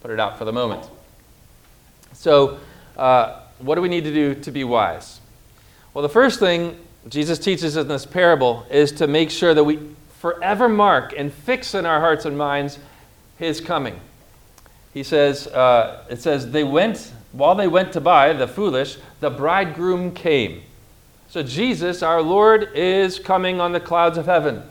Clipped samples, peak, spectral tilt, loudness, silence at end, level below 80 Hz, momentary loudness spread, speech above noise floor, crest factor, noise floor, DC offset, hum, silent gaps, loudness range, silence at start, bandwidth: under 0.1%; -2 dBFS; -5.5 dB/octave; -19 LUFS; 0 s; -52 dBFS; 12 LU; 32 dB; 18 dB; -50 dBFS; under 0.1%; none; none; 5 LU; 0.05 s; 17.5 kHz